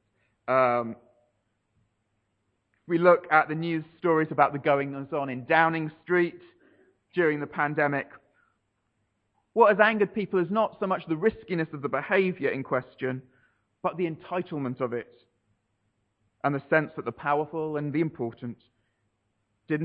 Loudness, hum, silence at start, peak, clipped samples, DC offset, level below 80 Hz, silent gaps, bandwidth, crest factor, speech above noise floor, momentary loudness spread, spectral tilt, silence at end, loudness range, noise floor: -26 LUFS; none; 0.5 s; -4 dBFS; under 0.1%; under 0.1%; -70 dBFS; none; 5.2 kHz; 22 dB; 50 dB; 12 LU; -9 dB/octave; 0 s; 7 LU; -76 dBFS